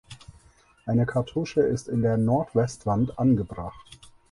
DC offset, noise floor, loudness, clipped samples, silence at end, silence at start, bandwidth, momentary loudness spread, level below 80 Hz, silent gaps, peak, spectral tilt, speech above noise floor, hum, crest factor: under 0.1%; -57 dBFS; -25 LUFS; under 0.1%; 0.35 s; 0.1 s; 11.5 kHz; 11 LU; -50 dBFS; none; -10 dBFS; -8 dB/octave; 33 dB; none; 16 dB